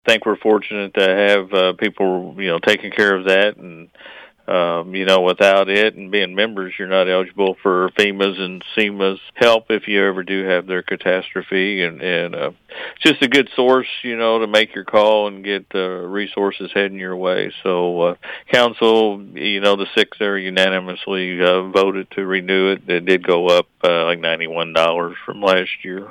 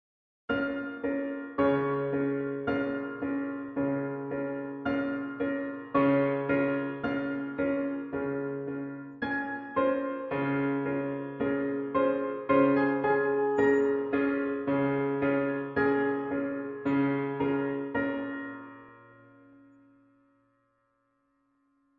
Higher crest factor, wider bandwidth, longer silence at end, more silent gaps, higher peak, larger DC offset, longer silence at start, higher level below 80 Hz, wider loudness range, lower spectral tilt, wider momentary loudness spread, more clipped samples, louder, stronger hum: about the same, 16 dB vs 18 dB; first, 15 kHz vs 4.6 kHz; second, 0 s vs 2.95 s; neither; first, -2 dBFS vs -12 dBFS; neither; second, 0.05 s vs 0.5 s; about the same, -62 dBFS vs -66 dBFS; second, 2 LU vs 6 LU; second, -4.5 dB/octave vs -9 dB/octave; about the same, 8 LU vs 9 LU; neither; first, -17 LUFS vs -30 LUFS; neither